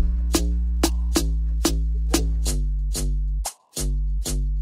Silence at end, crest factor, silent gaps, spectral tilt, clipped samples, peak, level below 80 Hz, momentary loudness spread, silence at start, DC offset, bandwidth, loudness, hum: 0 s; 16 dB; none; -4.5 dB/octave; under 0.1%; -6 dBFS; -22 dBFS; 5 LU; 0 s; under 0.1%; 16 kHz; -25 LUFS; none